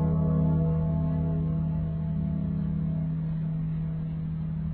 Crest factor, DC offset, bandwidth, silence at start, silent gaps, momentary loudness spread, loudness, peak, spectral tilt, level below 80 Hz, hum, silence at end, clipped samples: 12 dB; under 0.1%; 2.4 kHz; 0 s; none; 7 LU; -29 LUFS; -14 dBFS; -13.5 dB/octave; -40 dBFS; none; 0 s; under 0.1%